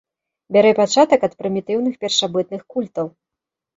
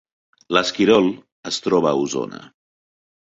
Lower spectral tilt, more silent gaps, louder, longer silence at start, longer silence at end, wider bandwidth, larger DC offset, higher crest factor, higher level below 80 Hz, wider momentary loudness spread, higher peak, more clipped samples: about the same, -4 dB/octave vs -4.5 dB/octave; second, none vs 1.32-1.43 s; about the same, -18 LUFS vs -19 LUFS; about the same, 0.5 s vs 0.5 s; second, 0.7 s vs 0.95 s; about the same, 7.8 kHz vs 8 kHz; neither; about the same, 18 dB vs 20 dB; about the same, -64 dBFS vs -60 dBFS; second, 12 LU vs 16 LU; about the same, -2 dBFS vs 0 dBFS; neither